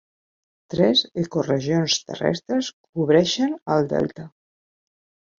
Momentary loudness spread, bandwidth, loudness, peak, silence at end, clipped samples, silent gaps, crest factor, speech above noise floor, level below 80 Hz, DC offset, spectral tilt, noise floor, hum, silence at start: 9 LU; 7.6 kHz; -22 LUFS; -4 dBFS; 1.1 s; under 0.1%; 2.73-2.93 s, 3.62-3.66 s; 18 dB; over 68 dB; -60 dBFS; under 0.1%; -5 dB/octave; under -90 dBFS; none; 0.7 s